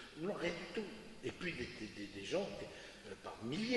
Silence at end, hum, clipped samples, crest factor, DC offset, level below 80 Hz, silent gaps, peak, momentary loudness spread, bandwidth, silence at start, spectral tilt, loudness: 0 s; none; under 0.1%; 20 dB; under 0.1%; -66 dBFS; none; -24 dBFS; 10 LU; 11.5 kHz; 0 s; -5 dB/octave; -45 LUFS